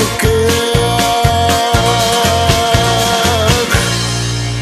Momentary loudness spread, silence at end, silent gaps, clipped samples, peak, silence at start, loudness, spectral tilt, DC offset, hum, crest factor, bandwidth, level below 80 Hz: 3 LU; 0 s; none; under 0.1%; 0 dBFS; 0 s; -12 LUFS; -4 dB/octave; under 0.1%; none; 12 dB; 14 kHz; -24 dBFS